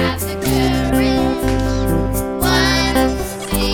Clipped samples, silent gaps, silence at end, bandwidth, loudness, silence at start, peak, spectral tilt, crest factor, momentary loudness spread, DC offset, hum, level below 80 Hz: under 0.1%; none; 0 s; 19 kHz; -17 LUFS; 0 s; -2 dBFS; -5 dB/octave; 14 dB; 6 LU; under 0.1%; none; -24 dBFS